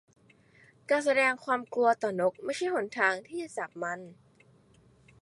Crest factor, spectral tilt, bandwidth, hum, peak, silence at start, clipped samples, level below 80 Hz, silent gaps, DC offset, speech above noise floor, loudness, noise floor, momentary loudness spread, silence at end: 20 dB; -4 dB/octave; 11.5 kHz; none; -12 dBFS; 0.9 s; under 0.1%; -76 dBFS; none; under 0.1%; 32 dB; -29 LUFS; -62 dBFS; 12 LU; 1.1 s